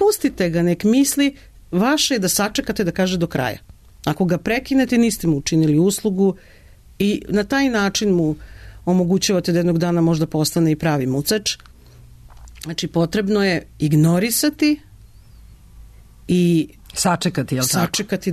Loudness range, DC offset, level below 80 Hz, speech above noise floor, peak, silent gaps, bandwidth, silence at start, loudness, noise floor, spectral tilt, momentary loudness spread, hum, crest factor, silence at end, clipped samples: 2 LU; under 0.1%; -44 dBFS; 26 dB; -6 dBFS; none; 14 kHz; 0 s; -19 LUFS; -44 dBFS; -5 dB/octave; 8 LU; none; 14 dB; 0 s; under 0.1%